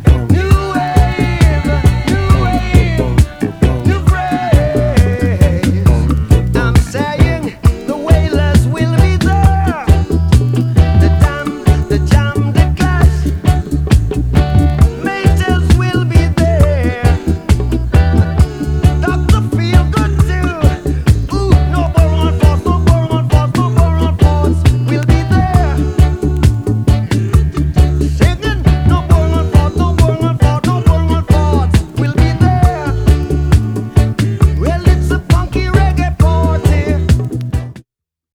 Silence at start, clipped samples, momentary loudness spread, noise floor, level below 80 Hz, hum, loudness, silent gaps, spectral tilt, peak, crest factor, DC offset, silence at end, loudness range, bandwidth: 0 s; 0.6%; 3 LU; -69 dBFS; -16 dBFS; none; -12 LUFS; none; -7 dB/octave; 0 dBFS; 10 dB; under 0.1%; 0.55 s; 1 LU; 13.5 kHz